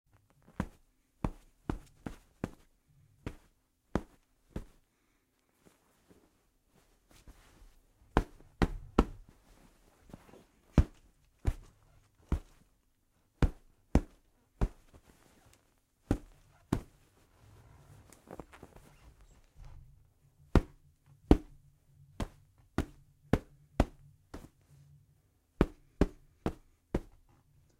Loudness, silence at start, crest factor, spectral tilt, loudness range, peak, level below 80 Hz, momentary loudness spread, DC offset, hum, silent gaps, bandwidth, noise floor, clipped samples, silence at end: -37 LUFS; 0.6 s; 34 dB; -7.5 dB/octave; 12 LU; -4 dBFS; -42 dBFS; 25 LU; under 0.1%; none; none; 15.5 kHz; -75 dBFS; under 0.1%; 0.8 s